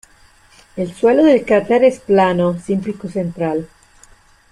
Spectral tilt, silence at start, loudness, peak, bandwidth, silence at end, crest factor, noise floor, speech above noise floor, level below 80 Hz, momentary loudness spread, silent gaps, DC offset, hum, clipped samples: -7 dB/octave; 0.75 s; -16 LUFS; -2 dBFS; 11 kHz; 0.85 s; 14 dB; -49 dBFS; 34 dB; -50 dBFS; 13 LU; none; under 0.1%; none; under 0.1%